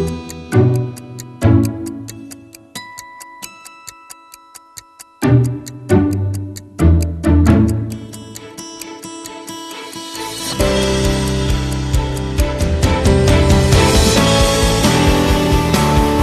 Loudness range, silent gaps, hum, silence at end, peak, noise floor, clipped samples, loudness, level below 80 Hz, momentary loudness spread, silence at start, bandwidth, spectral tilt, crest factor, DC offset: 10 LU; none; none; 0 s; 0 dBFS; -41 dBFS; under 0.1%; -15 LUFS; -22 dBFS; 20 LU; 0 s; 15 kHz; -5.5 dB/octave; 16 dB; under 0.1%